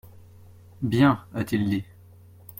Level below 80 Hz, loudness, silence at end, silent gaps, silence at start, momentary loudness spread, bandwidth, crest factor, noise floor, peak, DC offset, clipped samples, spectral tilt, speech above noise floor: -56 dBFS; -24 LUFS; 0.75 s; none; 0.8 s; 12 LU; 16.5 kHz; 20 dB; -50 dBFS; -6 dBFS; under 0.1%; under 0.1%; -7.5 dB/octave; 27 dB